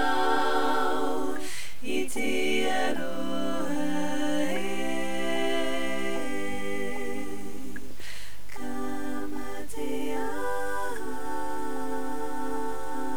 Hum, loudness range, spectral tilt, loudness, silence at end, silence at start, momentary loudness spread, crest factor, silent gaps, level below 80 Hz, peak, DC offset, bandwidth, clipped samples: none; 7 LU; -4 dB/octave; -31 LUFS; 0 s; 0 s; 11 LU; 18 dB; none; -54 dBFS; -12 dBFS; 6%; over 20 kHz; under 0.1%